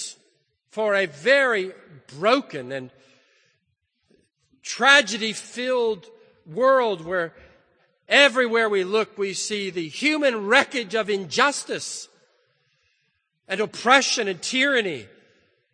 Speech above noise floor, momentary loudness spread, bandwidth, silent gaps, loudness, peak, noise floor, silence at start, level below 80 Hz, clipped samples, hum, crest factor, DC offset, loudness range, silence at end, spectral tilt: 52 dB; 17 LU; 9.8 kHz; none; -21 LUFS; 0 dBFS; -74 dBFS; 0 s; -72 dBFS; under 0.1%; none; 24 dB; under 0.1%; 4 LU; 0.7 s; -2 dB/octave